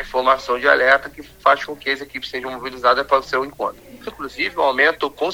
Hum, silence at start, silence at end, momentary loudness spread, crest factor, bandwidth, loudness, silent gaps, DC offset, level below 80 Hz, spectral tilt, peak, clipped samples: none; 0 s; 0 s; 14 LU; 20 dB; 19.5 kHz; -19 LUFS; none; under 0.1%; -50 dBFS; -3 dB/octave; 0 dBFS; under 0.1%